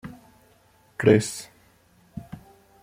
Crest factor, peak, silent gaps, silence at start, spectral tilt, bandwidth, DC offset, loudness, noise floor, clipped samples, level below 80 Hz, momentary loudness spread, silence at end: 24 dB; -4 dBFS; none; 0.05 s; -6 dB/octave; 16 kHz; under 0.1%; -22 LUFS; -59 dBFS; under 0.1%; -60 dBFS; 25 LU; 0.45 s